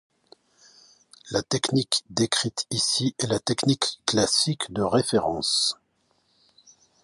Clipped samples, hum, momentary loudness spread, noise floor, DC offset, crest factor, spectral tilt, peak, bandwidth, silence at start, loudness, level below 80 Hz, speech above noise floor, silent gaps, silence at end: under 0.1%; none; 5 LU; -69 dBFS; under 0.1%; 24 dB; -3.5 dB/octave; -4 dBFS; 11.5 kHz; 1.25 s; -24 LUFS; -58 dBFS; 44 dB; none; 1.3 s